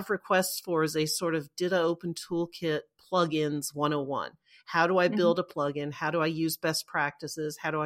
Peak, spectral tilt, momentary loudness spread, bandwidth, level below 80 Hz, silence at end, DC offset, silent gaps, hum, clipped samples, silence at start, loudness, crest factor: -10 dBFS; -4.5 dB/octave; 8 LU; 16.5 kHz; -72 dBFS; 0 s; under 0.1%; none; none; under 0.1%; 0 s; -29 LUFS; 18 dB